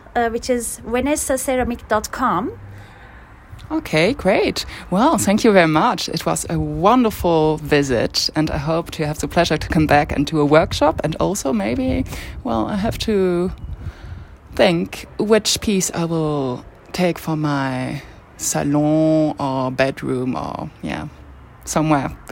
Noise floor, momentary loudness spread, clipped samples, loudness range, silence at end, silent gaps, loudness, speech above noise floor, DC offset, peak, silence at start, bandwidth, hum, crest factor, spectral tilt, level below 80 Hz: -41 dBFS; 13 LU; under 0.1%; 5 LU; 0 s; none; -19 LUFS; 23 dB; under 0.1%; 0 dBFS; 0.05 s; 16.5 kHz; none; 18 dB; -5 dB/octave; -38 dBFS